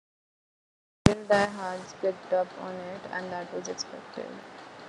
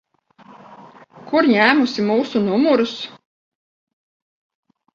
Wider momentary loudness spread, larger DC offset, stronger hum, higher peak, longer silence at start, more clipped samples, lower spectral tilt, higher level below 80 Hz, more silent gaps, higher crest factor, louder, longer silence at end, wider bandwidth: first, 15 LU vs 11 LU; neither; neither; about the same, 0 dBFS vs 0 dBFS; first, 1.05 s vs 0.7 s; neither; about the same, -5.5 dB/octave vs -5.5 dB/octave; first, -50 dBFS vs -66 dBFS; neither; first, 30 dB vs 20 dB; second, -30 LUFS vs -17 LUFS; second, 0 s vs 1.85 s; first, 11.5 kHz vs 7.6 kHz